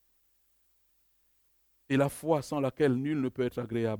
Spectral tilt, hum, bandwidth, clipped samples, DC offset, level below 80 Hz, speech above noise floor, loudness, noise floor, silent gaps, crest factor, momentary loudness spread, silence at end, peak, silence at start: -7 dB/octave; none; over 20 kHz; under 0.1%; under 0.1%; -66 dBFS; 41 dB; -30 LUFS; -70 dBFS; none; 20 dB; 5 LU; 0 s; -12 dBFS; 1.9 s